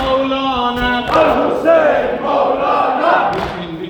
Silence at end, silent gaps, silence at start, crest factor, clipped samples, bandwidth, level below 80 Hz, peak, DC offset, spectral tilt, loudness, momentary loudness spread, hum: 0 s; none; 0 s; 14 dB; under 0.1%; 19 kHz; -38 dBFS; 0 dBFS; under 0.1%; -5.5 dB/octave; -14 LUFS; 5 LU; none